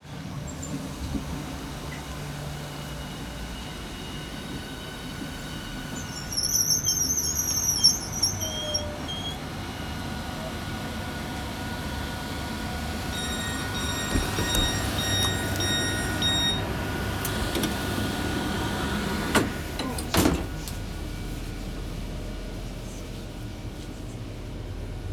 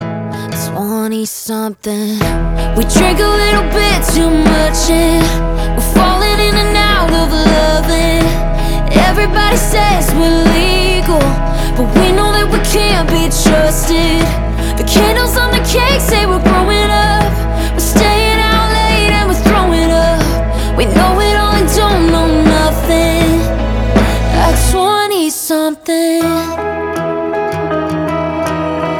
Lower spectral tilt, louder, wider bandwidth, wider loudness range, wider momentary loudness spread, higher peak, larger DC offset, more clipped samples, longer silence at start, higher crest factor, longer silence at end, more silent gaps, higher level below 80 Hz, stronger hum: second, -3 dB/octave vs -4.5 dB/octave; second, -28 LUFS vs -12 LUFS; about the same, over 20 kHz vs 19 kHz; first, 12 LU vs 2 LU; first, 14 LU vs 6 LU; second, -6 dBFS vs 0 dBFS; neither; neither; about the same, 0 s vs 0 s; first, 24 dB vs 10 dB; about the same, 0 s vs 0 s; neither; second, -38 dBFS vs -16 dBFS; neither